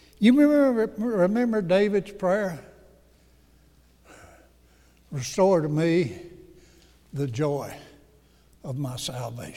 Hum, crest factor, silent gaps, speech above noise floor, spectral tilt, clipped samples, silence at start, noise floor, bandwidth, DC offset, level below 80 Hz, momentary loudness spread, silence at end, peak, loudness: none; 18 dB; none; 35 dB; -6.5 dB/octave; under 0.1%; 0.2 s; -58 dBFS; 15.5 kHz; under 0.1%; -58 dBFS; 19 LU; 0 s; -6 dBFS; -24 LUFS